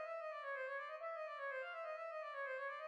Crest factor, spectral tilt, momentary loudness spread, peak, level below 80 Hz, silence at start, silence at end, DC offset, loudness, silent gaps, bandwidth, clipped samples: 10 dB; 1.5 dB/octave; 2 LU; -36 dBFS; under -90 dBFS; 0 s; 0 s; under 0.1%; -47 LUFS; none; 10 kHz; under 0.1%